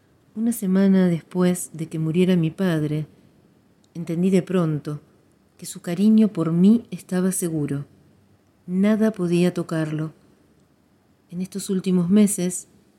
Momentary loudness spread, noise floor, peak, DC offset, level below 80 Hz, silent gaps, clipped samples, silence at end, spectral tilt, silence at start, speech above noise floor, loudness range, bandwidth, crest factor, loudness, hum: 16 LU; -60 dBFS; -6 dBFS; under 0.1%; -64 dBFS; none; under 0.1%; 0.35 s; -6.5 dB/octave; 0.35 s; 39 dB; 4 LU; 15.5 kHz; 16 dB; -22 LUFS; none